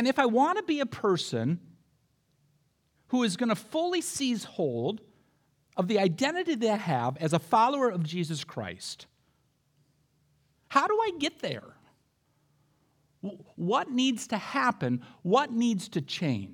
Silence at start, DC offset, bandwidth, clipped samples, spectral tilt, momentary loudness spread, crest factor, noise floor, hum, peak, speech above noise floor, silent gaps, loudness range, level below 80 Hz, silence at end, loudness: 0 s; under 0.1%; 17 kHz; under 0.1%; -5 dB/octave; 12 LU; 22 dB; -71 dBFS; none; -8 dBFS; 43 dB; none; 5 LU; -76 dBFS; 0 s; -29 LUFS